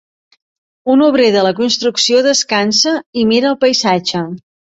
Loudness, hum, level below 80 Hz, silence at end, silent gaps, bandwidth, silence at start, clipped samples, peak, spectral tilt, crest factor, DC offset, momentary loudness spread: -12 LUFS; none; -58 dBFS; 0.4 s; 3.06-3.13 s; 8.2 kHz; 0.85 s; under 0.1%; 0 dBFS; -3 dB/octave; 14 dB; under 0.1%; 9 LU